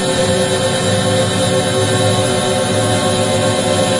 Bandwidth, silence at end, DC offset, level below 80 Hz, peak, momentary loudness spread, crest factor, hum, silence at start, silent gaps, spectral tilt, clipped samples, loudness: 11.5 kHz; 0 s; under 0.1%; -42 dBFS; -2 dBFS; 1 LU; 12 dB; none; 0 s; none; -4 dB/octave; under 0.1%; -14 LUFS